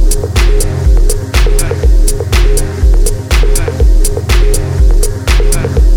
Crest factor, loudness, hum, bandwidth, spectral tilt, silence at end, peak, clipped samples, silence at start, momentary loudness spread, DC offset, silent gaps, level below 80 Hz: 8 dB; -12 LUFS; none; 18 kHz; -4.5 dB/octave; 0 s; 0 dBFS; under 0.1%; 0 s; 2 LU; under 0.1%; none; -8 dBFS